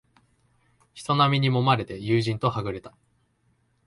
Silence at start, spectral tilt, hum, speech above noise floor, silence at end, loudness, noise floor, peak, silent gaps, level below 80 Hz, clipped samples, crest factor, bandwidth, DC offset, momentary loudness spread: 0.95 s; -6.5 dB/octave; none; 44 dB; 1 s; -24 LUFS; -68 dBFS; -6 dBFS; none; -56 dBFS; under 0.1%; 20 dB; 11.5 kHz; under 0.1%; 13 LU